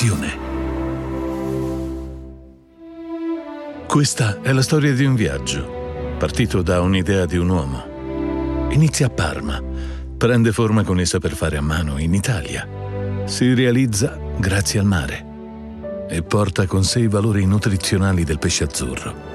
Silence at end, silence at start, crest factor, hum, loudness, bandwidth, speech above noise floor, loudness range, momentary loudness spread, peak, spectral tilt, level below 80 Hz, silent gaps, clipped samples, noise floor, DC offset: 0 s; 0 s; 16 dB; none; -20 LUFS; 13.5 kHz; 25 dB; 4 LU; 12 LU; -2 dBFS; -5.5 dB/octave; -34 dBFS; none; under 0.1%; -42 dBFS; under 0.1%